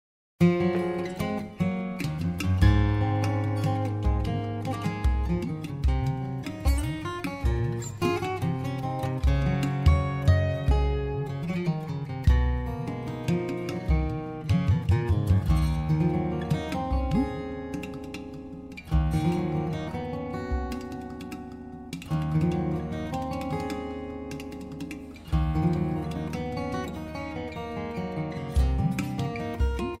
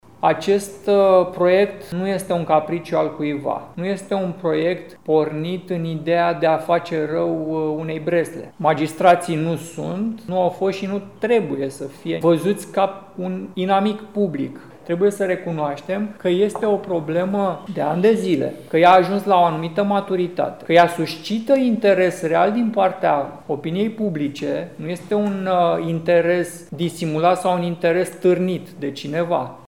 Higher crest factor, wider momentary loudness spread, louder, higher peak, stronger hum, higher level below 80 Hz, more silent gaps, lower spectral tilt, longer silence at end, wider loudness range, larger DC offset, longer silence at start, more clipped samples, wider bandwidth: about the same, 18 dB vs 20 dB; about the same, 11 LU vs 10 LU; second, -28 LUFS vs -20 LUFS; second, -8 dBFS vs 0 dBFS; neither; first, -32 dBFS vs -62 dBFS; neither; about the same, -7.5 dB/octave vs -6.5 dB/octave; about the same, 0.05 s vs 0.1 s; about the same, 5 LU vs 4 LU; second, under 0.1% vs 0.2%; first, 0.4 s vs 0.2 s; neither; second, 14.5 kHz vs 17 kHz